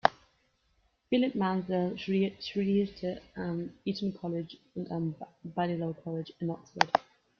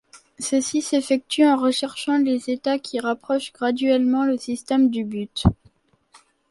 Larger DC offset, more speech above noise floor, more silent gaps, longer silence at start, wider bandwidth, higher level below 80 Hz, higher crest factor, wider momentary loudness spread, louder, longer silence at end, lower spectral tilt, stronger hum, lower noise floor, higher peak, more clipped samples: neither; about the same, 40 dB vs 38 dB; neither; about the same, 0.05 s vs 0.15 s; second, 7 kHz vs 11.5 kHz; second, -66 dBFS vs -42 dBFS; first, 30 dB vs 20 dB; about the same, 10 LU vs 8 LU; second, -33 LUFS vs -22 LUFS; second, 0.4 s vs 0.95 s; first, -6.5 dB/octave vs -5 dB/octave; neither; first, -72 dBFS vs -59 dBFS; about the same, -4 dBFS vs -2 dBFS; neither